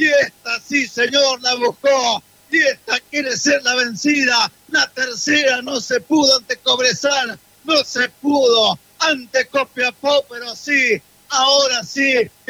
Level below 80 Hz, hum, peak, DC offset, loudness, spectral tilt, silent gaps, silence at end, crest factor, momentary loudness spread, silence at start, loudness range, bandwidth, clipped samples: -64 dBFS; none; -2 dBFS; under 0.1%; -16 LUFS; -1.5 dB/octave; none; 0.2 s; 16 dB; 7 LU; 0 s; 1 LU; 16.5 kHz; under 0.1%